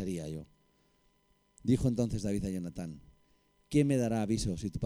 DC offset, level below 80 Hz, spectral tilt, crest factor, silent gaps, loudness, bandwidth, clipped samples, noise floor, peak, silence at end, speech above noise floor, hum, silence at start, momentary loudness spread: under 0.1%; -50 dBFS; -7 dB/octave; 18 dB; none; -32 LUFS; 15.5 kHz; under 0.1%; -71 dBFS; -16 dBFS; 0 s; 39 dB; none; 0 s; 14 LU